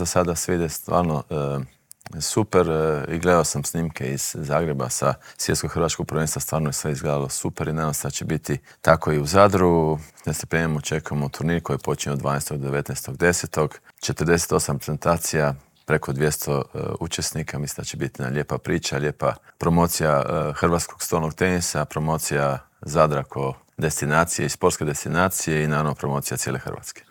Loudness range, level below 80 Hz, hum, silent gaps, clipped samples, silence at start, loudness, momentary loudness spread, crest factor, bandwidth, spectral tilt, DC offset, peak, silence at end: 4 LU; -48 dBFS; none; none; under 0.1%; 0 s; -23 LUFS; 9 LU; 22 dB; 19.5 kHz; -4.5 dB/octave; under 0.1%; 0 dBFS; 0.1 s